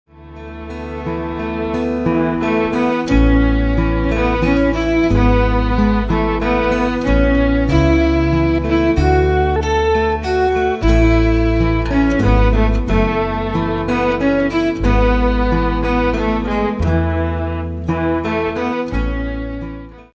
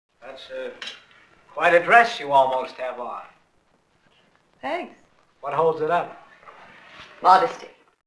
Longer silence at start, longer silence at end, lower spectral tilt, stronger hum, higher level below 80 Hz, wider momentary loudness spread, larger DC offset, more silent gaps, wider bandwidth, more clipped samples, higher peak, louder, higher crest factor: about the same, 0.15 s vs 0.25 s; second, 0.15 s vs 0.4 s; first, -7.5 dB/octave vs -4 dB/octave; neither; first, -20 dBFS vs -70 dBFS; second, 9 LU vs 22 LU; neither; neither; second, 8 kHz vs 11 kHz; neither; about the same, 0 dBFS vs 0 dBFS; first, -16 LUFS vs -20 LUFS; second, 14 dB vs 24 dB